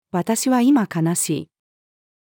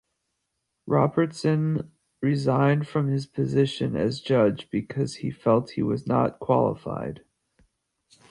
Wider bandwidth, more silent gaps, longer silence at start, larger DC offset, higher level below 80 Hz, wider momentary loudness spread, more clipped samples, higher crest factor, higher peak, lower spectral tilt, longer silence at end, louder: first, 19 kHz vs 11 kHz; neither; second, 0.15 s vs 0.85 s; neither; second, -74 dBFS vs -58 dBFS; about the same, 7 LU vs 9 LU; neither; about the same, 14 dB vs 18 dB; about the same, -6 dBFS vs -8 dBFS; second, -5 dB/octave vs -7.5 dB/octave; second, 0.85 s vs 1.15 s; first, -19 LUFS vs -25 LUFS